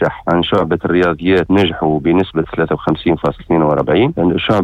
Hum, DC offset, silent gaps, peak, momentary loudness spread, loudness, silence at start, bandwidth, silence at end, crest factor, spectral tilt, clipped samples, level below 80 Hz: none; under 0.1%; none; -4 dBFS; 4 LU; -14 LUFS; 0 s; 8 kHz; 0 s; 10 dB; -8 dB/octave; under 0.1%; -38 dBFS